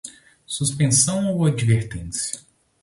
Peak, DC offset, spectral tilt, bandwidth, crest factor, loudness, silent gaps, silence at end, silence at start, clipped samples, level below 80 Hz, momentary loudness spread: -6 dBFS; under 0.1%; -4.5 dB/octave; 11.5 kHz; 16 dB; -21 LUFS; none; 0.45 s; 0.05 s; under 0.1%; -46 dBFS; 14 LU